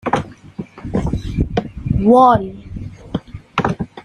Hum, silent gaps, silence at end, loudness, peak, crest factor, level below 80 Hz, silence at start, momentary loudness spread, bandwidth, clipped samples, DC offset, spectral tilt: none; none; 0.05 s; -17 LUFS; -2 dBFS; 16 dB; -32 dBFS; 0.05 s; 22 LU; 11.5 kHz; under 0.1%; under 0.1%; -8 dB/octave